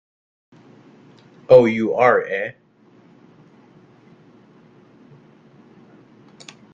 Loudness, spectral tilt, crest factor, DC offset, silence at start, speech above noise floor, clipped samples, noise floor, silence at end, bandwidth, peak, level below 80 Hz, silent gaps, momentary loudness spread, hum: -16 LUFS; -7 dB/octave; 22 dB; under 0.1%; 1.5 s; 38 dB; under 0.1%; -53 dBFS; 4.2 s; 7.4 kHz; 0 dBFS; -62 dBFS; none; 30 LU; none